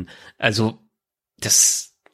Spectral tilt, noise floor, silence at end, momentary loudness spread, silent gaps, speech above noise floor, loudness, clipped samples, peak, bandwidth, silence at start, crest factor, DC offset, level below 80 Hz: -2 dB/octave; -82 dBFS; 0.3 s; 15 LU; none; 62 dB; -17 LUFS; under 0.1%; -2 dBFS; 16.5 kHz; 0 s; 20 dB; under 0.1%; -58 dBFS